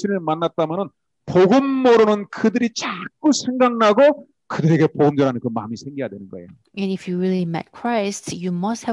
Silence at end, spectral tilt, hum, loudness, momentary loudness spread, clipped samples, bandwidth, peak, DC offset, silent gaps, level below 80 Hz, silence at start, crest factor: 0 s; -6 dB/octave; none; -19 LUFS; 15 LU; under 0.1%; 11.5 kHz; -4 dBFS; under 0.1%; none; -64 dBFS; 0 s; 14 dB